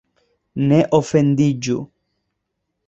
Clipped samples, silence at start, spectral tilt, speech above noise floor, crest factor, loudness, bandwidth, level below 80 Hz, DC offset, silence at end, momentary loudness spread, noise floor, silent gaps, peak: under 0.1%; 0.55 s; -7 dB/octave; 60 dB; 18 dB; -17 LUFS; 8 kHz; -54 dBFS; under 0.1%; 1 s; 14 LU; -76 dBFS; none; -2 dBFS